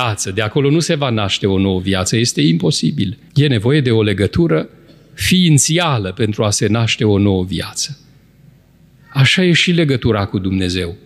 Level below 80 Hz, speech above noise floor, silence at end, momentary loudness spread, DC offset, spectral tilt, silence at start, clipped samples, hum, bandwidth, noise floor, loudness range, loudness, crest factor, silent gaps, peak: -42 dBFS; 33 dB; 0.1 s; 8 LU; under 0.1%; -4.5 dB/octave; 0 s; under 0.1%; none; 14.5 kHz; -48 dBFS; 2 LU; -15 LUFS; 14 dB; none; -2 dBFS